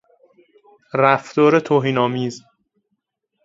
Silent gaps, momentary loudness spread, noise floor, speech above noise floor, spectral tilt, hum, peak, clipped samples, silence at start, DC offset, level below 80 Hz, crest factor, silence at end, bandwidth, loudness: none; 12 LU; -74 dBFS; 57 dB; -6.5 dB/octave; none; 0 dBFS; under 0.1%; 0.95 s; under 0.1%; -66 dBFS; 20 dB; 1.05 s; 7.8 kHz; -18 LUFS